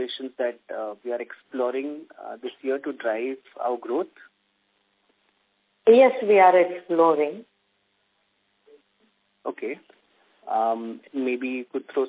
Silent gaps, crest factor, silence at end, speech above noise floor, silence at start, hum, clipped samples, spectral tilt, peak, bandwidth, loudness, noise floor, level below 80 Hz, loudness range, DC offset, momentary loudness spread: none; 22 dB; 0 s; 47 dB; 0 s; none; under 0.1%; -8.5 dB/octave; -4 dBFS; 4 kHz; -24 LUFS; -70 dBFS; -82 dBFS; 12 LU; under 0.1%; 19 LU